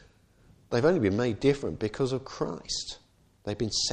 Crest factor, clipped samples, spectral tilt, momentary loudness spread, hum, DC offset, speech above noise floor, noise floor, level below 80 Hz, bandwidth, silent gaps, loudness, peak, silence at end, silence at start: 18 dB; under 0.1%; -4.5 dB/octave; 13 LU; none; under 0.1%; 32 dB; -60 dBFS; -54 dBFS; 9.6 kHz; none; -29 LUFS; -12 dBFS; 0 s; 0.7 s